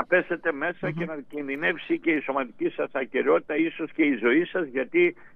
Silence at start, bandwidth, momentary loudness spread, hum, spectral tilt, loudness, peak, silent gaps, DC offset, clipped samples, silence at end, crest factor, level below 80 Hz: 0 s; 3.9 kHz; 8 LU; none; -8 dB/octave; -26 LUFS; -8 dBFS; none; under 0.1%; under 0.1%; 0 s; 16 dB; -68 dBFS